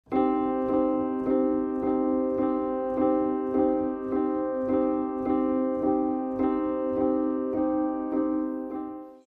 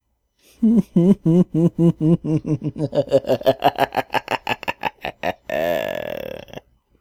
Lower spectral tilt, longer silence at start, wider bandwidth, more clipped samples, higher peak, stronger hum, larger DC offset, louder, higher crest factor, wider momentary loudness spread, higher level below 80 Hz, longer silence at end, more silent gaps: first, -10 dB/octave vs -7.5 dB/octave; second, 0.1 s vs 0.6 s; second, 3.7 kHz vs 16 kHz; neither; second, -12 dBFS vs 0 dBFS; neither; neither; second, -27 LUFS vs -20 LUFS; second, 14 dB vs 20 dB; second, 3 LU vs 11 LU; second, -56 dBFS vs -50 dBFS; second, 0.1 s vs 0.4 s; neither